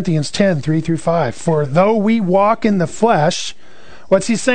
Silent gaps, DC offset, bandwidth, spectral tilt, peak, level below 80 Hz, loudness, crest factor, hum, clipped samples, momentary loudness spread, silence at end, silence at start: none; 3%; 9.4 kHz; -6 dB/octave; 0 dBFS; -48 dBFS; -15 LUFS; 14 dB; none; under 0.1%; 5 LU; 0 s; 0 s